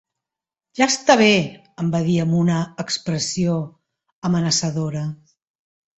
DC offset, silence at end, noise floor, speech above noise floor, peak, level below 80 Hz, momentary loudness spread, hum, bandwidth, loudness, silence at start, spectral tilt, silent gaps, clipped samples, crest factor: under 0.1%; 0.8 s; -88 dBFS; 69 dB; -2 dBFS; -56 dBFS; 14 LU; none; 8.2 kHz; -20 LUFS; 0.75 s; -4.5 dB/octave; 4.13-4.22 s; under 0.1%; 20 dB